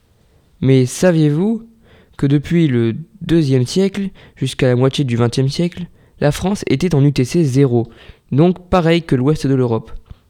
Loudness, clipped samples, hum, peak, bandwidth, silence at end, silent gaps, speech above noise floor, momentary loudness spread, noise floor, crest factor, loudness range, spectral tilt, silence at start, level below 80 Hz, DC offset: -16 LUFS; under 0.1%; none; 0 dBFS; 14 kHz; 0.3 s; none; 38 dB; 9 LU; -53 dBFS; 16 dB; 2 LU; -7 dB/octave; 0.6 s; -40 dBFS; under 0.1%